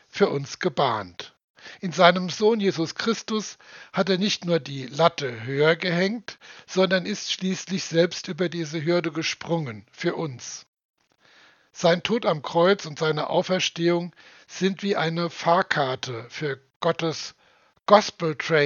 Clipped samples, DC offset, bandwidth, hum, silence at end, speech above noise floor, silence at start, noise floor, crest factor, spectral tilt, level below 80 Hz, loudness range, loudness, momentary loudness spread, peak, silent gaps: under 0.1%; under 0.1%; 7.4 kHz; none; 0 s; 37 dB; 0.15 s; -61 dBFS; 24 dB; -4.5 dB/octave; -74 dBFS; 4 LU; -24 LUFS; 14 LU; 0 dBFS; 1.44-1.54 s, 10.68-10.73 s, 10.85-10.94 s, 16.76-16.80 s